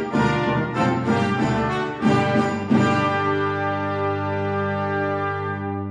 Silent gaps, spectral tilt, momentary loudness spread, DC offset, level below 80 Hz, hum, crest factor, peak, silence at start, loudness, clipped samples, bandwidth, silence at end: none; -7 dB/octave; 5 LU; under 0.1%; -48 dBFS; none; 16 dB; -6 dBFS; 0 s; -22 LUFS; under 0.1%; 10.5 kHz; 0 s